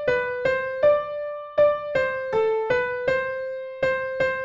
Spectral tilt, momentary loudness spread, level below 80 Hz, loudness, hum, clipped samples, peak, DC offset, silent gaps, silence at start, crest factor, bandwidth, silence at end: -5.5 dB/octave; 8 LU; -56 dBFS; -24 LUFS; none; under 0.1%; -10 dBFS; under 0.1%; none; 0 s; 14 dB; 7.4 kHz; 0 s